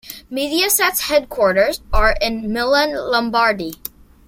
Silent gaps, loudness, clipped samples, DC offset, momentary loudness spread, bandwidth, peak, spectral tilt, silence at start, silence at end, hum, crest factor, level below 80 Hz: none; -17 LUFS; under 0.1%; under 0.1%; 10 LU; 16.5 kHz; 0 dBFS; -2.5 dB/octave; 0.05 s; 0.55 s; none; 16 dB; -30 dBFS